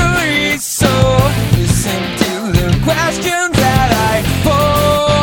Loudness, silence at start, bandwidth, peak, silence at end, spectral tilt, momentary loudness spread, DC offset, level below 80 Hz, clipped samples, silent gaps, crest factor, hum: -13 LUFS; 0 s; over 20 kHz; 0 dBFS; 0 s; -4.5 dB/octave; 4 LU; under 0.1%; -26 dBFS; under 0.1%; none; 12 dB; none